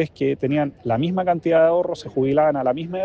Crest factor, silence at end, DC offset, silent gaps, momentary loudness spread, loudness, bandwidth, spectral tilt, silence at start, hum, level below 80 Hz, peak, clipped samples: 14 dB; 0 s; under 0.1%; none; 7 LU; -20 LUFS; 8 kHz; -8 dB/octave; 0 s; none; -56 dBFS; -6 dBFS; under 0.1%